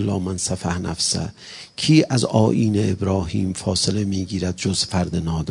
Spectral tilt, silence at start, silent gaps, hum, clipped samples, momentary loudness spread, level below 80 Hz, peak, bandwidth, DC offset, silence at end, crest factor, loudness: -5 dB/octave; 0 s; none; none; under 0.1%; 8 LU; -46 dBFS; -2 dBFS; 11 kHz; under 0.1%; 0 s; 20 dB; -21 LUFS